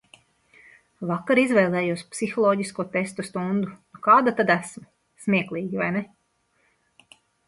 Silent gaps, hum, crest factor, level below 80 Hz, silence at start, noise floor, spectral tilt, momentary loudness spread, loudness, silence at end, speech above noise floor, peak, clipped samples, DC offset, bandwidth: none; none; 20 dB; -68 dBFS; 1 s; -69 dBFS; -6 dB/octave; 12 LU; -23 LUFS; 1.45 s; 46 dB; -4 dBFS; under 0.1%; under 0.1%; 11.5 kHz